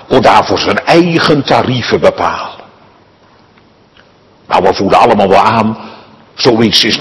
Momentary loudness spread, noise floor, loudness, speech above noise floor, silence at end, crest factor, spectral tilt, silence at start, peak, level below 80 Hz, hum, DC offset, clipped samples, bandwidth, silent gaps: 8 LU; -45 dBFS; -9 LUFS; 36 dB; 0 s; 10 dB; -5 dB/octave; 0.1 s; 0 dBFS; -42 dBFS; none; under 0.1%; 3%; 12 kHz; none